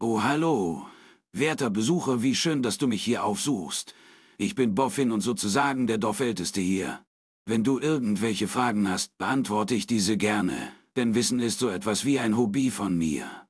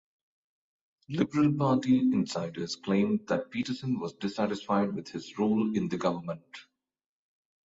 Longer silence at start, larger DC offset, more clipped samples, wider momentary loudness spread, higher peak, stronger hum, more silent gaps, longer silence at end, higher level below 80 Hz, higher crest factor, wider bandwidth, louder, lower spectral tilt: second, 0 s vs 1.1 s; neither; neither; second, 7 LU vs 12 LU; about the same, -10 dBFS vs -12 dBFS; neither; first, 7.07-7.45 s vs none; second, 0.1 s vs 1.05 s; first, -62 dBFS vs -68 dBFS; about the same, 18 dB vs 18 dB; first, 11 kHz vs 8 kHz; first, -26 LUFS vs -29 LUFS; second, -4.5 dB/octave vs -6.5 dB/octave